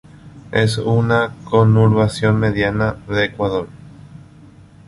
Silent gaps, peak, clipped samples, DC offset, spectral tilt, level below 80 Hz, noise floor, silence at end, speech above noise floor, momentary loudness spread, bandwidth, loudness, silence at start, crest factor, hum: none; -2 dBFS; under 0.1%; under 0.1%; -7 dB/octave; -40 dBFS; -43 dBFS; 0.7 s; 27 dB; 8 LU; 11.5 kHz; -17 LUFS; 0.25 s; 16 dB; 50 Hz at -35 dBFS